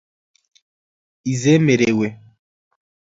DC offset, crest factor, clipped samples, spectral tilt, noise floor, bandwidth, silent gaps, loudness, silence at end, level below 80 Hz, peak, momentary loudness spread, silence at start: under 0.1%; 20 dB; under 0.1%; -6 dB/octave; under -90 dBFS; 7.8 kHz; none; -17 LUFS; 1 s; -58 dBFS; -2 dBFS; 12 LU; 1.25 s